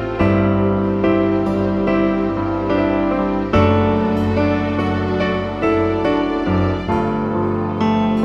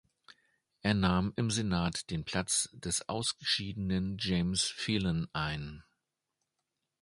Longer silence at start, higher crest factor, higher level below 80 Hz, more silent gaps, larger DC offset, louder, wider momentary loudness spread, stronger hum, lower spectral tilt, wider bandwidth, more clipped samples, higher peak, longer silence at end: second, 0 s vs 0.85 s; second, 16 dB vs 22 dB; first, -36 dBFS vs -52 dBFS; neither; neither; first, -18 LUFS vs -32 LUFS; about the same, 4 LU vs 6 LU; neither; first, -8.5 dB/octave vs -4 dB/octave; second, 7.2 kHz vs 11.5 kHz; neither; first, -2 dBFS vs -12 dBFS; second, 0 s vs 1.2 s